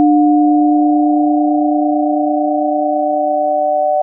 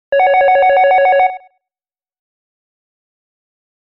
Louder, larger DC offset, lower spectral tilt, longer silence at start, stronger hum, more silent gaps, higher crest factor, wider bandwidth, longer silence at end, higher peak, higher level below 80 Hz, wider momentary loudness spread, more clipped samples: about the same, -13 LUFS vs -11 LUFS; neither; first, -14.5 dB/octave vs -3.5 dB/octave; about the same, 0 s vs 0.1 s; neither; neither; about the same, 10 dB vs 12 dB; second, 0.9 kHz vs 5.6 kHz; second, 0 s vs 2.6 s; about the same, -4 dBFS vs -4 dBFS; second, -84 dBFS vs -56 dBFS; about the same, 4 LU vs 3 LU; neither